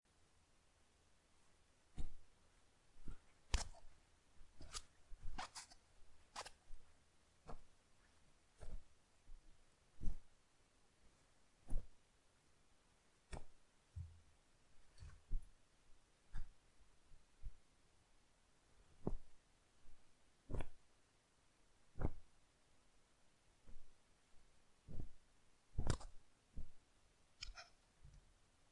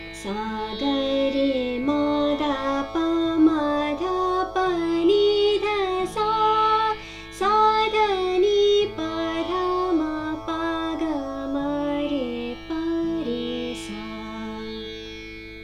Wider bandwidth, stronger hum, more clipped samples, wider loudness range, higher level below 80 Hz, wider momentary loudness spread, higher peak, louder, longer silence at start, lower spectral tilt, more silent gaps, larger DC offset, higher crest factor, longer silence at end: about the same, 11 kHz vs 12 kHz; second, none vs 50 Hz at -45 dBFS; neither; first, 10 LU vs 7 LU; second, -54 dBFS vs -48 dBFS; first, 19 LU vs 13 LU; second, -24 dBFS vs -8 dBFS; second, -55 LUFS vs -23 LUFS; first, 1.95 s vs 0 s; about the same, -4.5 dB/octave vs -5 dB/octave; neither; neither; first, 26 dB vs 16 dB; first, 0.5 s vs 0 s